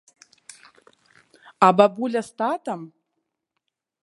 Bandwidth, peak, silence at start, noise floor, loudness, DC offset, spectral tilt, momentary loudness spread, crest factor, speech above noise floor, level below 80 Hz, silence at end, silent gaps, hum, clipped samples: 11.5 kHz; 0 dBFS; 1.6 s; -80 dBFS; -21 LUFS; under 0.1%; -6 dB/octave; 15 LU; 24 dB; 59 dB; -74 dBFS; 1.15 s; none; none; under 0.1%